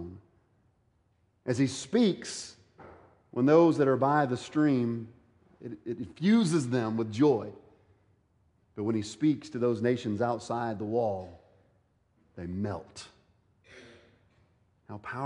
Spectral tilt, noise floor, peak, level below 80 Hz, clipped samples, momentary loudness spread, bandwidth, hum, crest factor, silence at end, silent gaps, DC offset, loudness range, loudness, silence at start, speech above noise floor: -6.5 dB/octave; -70 dBFS; -10 dBFS; -68 dBFS; under 0.1%; 20 LU; 11 kHz; none; 20 dB; 0 s; none; under 0.1%; 12 LU; -29 LUFS; 0 s; 42 dB